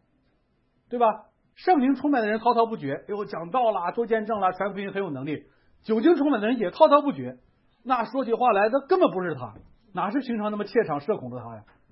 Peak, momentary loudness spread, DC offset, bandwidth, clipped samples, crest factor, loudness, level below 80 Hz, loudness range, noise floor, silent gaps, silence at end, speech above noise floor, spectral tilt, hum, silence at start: -4 dBFS; 15 LU; under 0.1%; 5.8 kHz; under 0.1%; 20 dB; -24 LUFS; -66 dBFS; 4 LU; -68 dBFS; none; 0.3 s; 44 dB; -10.5 dB/octave; none; 0.9 s